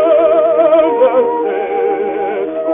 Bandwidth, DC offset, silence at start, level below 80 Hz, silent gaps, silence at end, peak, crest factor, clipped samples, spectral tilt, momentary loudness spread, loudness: 3.7 kHz; under 0.1%; 0 s; -54 dBFS; none; 0 s; 0 dBFS; 12 dB; under 0.1%; -3 dB/octave; 8 LU; -13 LUFS